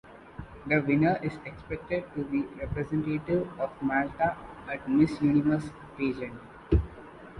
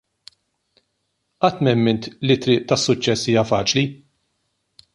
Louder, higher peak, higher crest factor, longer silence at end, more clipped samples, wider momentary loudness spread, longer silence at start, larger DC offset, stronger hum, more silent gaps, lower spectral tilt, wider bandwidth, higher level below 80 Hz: second, -29 LUFS vs -19 LUFS; second, -10 dBFS vs -2 dBFS; about the same, 18 dB vs 18 dB; second, 0 s vs 1 s; neither; first, 17 LU vs 4 LU; second, 0.05 s vs 1.4 s; neither; neither; neither; first, -8.5 dB/octave vs -5 dB/octave; about the same, 10.5 kHz vs 11.5 kHz; first, -42 dBFS vs -54 dBFS